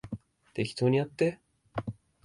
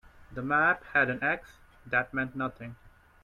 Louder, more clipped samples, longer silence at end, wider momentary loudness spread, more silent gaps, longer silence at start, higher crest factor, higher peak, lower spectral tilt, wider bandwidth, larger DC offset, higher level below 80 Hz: about the same, -31 LUFS vs -29 LUFS; neither; about the same, 0.35 s vs 0.35 s; about the same, 16 LU vs 17 LU; neither; second, 0.05 s vs 0.3 s; about the same, 18 dB vs 20 dB; about the same, -14 dBFS vs -12 dBFS; about the same, -7 dB/octave vs -7 dB/octave; second, 11.5 kHz vs 13.5 kHz; neither; about the same, -60 dBFS vs -58 dBFS